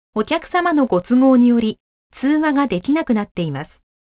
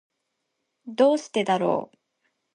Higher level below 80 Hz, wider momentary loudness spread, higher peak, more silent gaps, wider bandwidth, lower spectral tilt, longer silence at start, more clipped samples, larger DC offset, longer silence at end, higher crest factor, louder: first, -52 dBFS vs -78 dBFS; first, 12 LU vs 8 LU; first, -4 dBFS vs -8 dBFS; first, 1.80-2.10 s, 3.31-3.35 s vs none; second, 4 kHz vs 10.5 kHz; first, -10.5 dB/octave vs -5.5 dB/octave; second, 0.15 s vs 0.85 s; neither; neither; second, 0.35 s vs 0.7 s; second, 14 dB vs 20 dB; first, -17 LUFS vs -23 LUFS